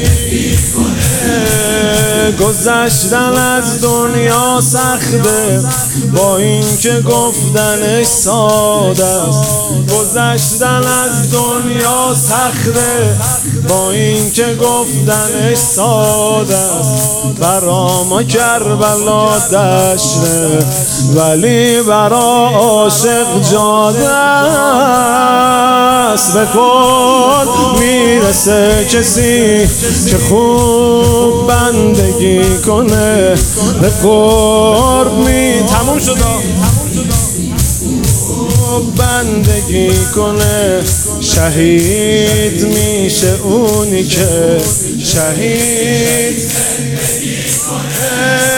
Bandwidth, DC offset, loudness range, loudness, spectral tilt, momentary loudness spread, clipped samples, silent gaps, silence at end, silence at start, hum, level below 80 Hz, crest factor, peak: 18.5 kHz; under 0.1%; 3 LU; -10 LUFS; -4 dB/octave; 4 LU; 0.1%; none; 0 s; 0 s; none; -26 dBFS; 10 dB; 0 dBFS